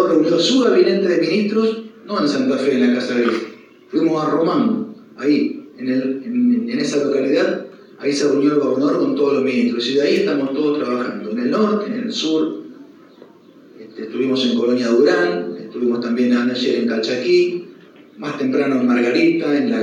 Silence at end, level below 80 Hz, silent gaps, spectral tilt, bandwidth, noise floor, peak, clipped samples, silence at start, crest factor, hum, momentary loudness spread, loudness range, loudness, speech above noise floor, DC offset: 0 s; -84 dBFS; none; -5 dB/octave; 10 kHz; -45 dBFS; -2 dBFS; under 0.1%; 0 s; 14 dB; none; 10 LU; 3 LU; -18 LUFS; 29 dB; under 0.1%